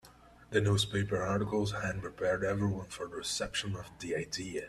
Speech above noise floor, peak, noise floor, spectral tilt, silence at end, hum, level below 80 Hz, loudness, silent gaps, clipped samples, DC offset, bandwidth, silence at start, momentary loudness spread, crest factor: 24 dB; -14 dBFS; -58 dBFS; -4.5 dB/octave; 0 s; none; -56 dBFS; -34 LUFS; none; under 0.1%; under 0.1%; 13.5 kHz; 0.05 s; 9 LU; 20 dB